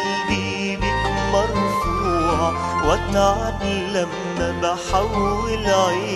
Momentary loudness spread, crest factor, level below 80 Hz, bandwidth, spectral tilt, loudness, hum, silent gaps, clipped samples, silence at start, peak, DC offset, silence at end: 5 LU; 16 dB; -32 dBFS; 13.5 kHz; -5 dB/octave; -21 LUFS; none; none; under 0.1%; 0 s; -4 dBFS; under 0.1%; 0 s